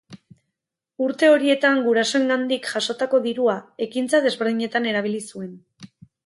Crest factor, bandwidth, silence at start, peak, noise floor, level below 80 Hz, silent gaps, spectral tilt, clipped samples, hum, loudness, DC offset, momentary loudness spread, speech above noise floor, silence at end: 16 dB; 11.5 kHz; 0.1 s; -6 dBFS; -83 dBFS; -72 dBFS; none; -3.5 dB/octave; under 0.1%; none; -21 LUFS; under 0.1%; 11 LU; 62 dB; 0.4 s